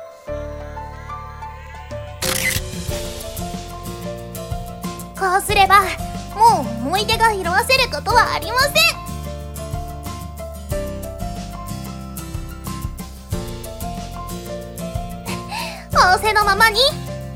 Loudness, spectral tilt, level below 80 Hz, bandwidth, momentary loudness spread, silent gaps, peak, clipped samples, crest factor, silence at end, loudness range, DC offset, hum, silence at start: -19 LUFS; -3 dB/octave; -34 dBFS; 17.5 kHz; 18 LU; none; -2 dBFS; under 0.1%; 20 dB; 0 s; 13 LU; under 0.1%; none; 0 s